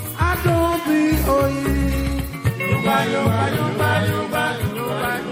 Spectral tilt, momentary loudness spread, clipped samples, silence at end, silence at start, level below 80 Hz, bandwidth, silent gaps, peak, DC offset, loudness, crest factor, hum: -6 dB/octave; 5 LU; under 0.1%; 0 s; 0 s; -30 dBFS; 16.5 kHz; none; -4 dBFS; under 0.1%; -20 LUFS; 16 dB; none